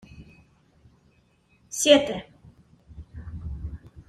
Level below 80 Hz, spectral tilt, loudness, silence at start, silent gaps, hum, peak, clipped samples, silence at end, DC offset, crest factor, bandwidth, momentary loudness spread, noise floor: -46 dBFS; -3 dB/octave; -23 LUFS; 0.15 s; none; none; -4 dBFS; under 0.1%; 0.1 s; under 0.1%; 24 dB; 14.5 kHz; 23 LU; -63 dBFS